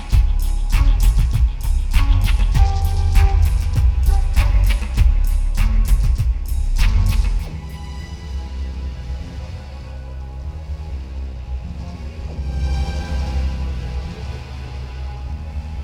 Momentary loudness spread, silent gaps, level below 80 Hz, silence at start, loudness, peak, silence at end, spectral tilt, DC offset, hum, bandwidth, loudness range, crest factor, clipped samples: 13 LU; none; -18 dBFS; 0 s; -22 LUFS; -2 dBFS; 0 s; -6 dB/octave; under 0.1%; none; 14.5 kHz; 12 LU; 14 dB; under 0.1%